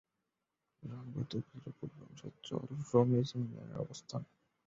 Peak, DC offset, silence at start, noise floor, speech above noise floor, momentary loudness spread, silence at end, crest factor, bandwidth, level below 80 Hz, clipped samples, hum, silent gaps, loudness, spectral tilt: -16 dBFS; under 0.1%; 0.8 s; -88 dBFS; 50 dB; 19 LU; 0.4 s; 24 dB; 7.6 kHz; -72 dBFS; under 0.1%; none; none; -38 LUFS; -8 dB/octave